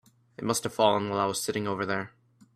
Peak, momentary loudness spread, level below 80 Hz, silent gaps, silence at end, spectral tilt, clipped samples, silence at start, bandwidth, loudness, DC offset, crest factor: -6 dBFS; 9 LU; -68 dBFS; none; 0.45 s; -4 dB/octave; under 0.1%; 0.4 s; 15.5 kHz; -28 LUFS; under 0.1%; 22 dB